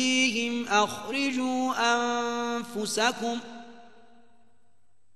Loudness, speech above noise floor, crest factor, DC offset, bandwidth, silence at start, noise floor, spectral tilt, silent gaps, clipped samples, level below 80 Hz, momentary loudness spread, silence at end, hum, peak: -27 LUFS; 46 dB; 20 dB; 0.3%; 13 kHz; 0 s; -73 dBFS; -2 dB/octave; none; under 0.1%; -72 dBFS; 8 LU; 1.3 s; none; -8 dBFS